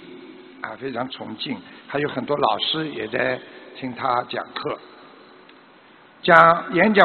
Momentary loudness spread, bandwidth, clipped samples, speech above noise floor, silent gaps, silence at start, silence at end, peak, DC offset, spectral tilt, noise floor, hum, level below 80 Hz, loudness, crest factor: 20 LU; 4.6 kHz; under 0.1%; 29 dB; none; 0 s; 0 s; 0 dBFS; under 0.1%; -2 dB/octave; -50 dBFS; none; -62 dBFS; -21 LUFS; 22 dB